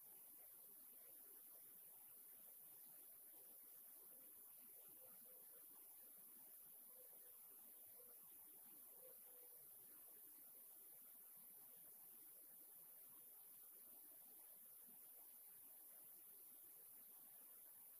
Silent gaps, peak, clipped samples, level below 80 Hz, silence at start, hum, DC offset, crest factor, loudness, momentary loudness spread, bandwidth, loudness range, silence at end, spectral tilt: none; -48 dBFS; under 0.1%; under -90 dBFS; 0 s; none; under 0.1%; 16 dB; -60 LUFS; 0 LU; 15.5 kHz; 0 LU; 0 s; -1 dB/octave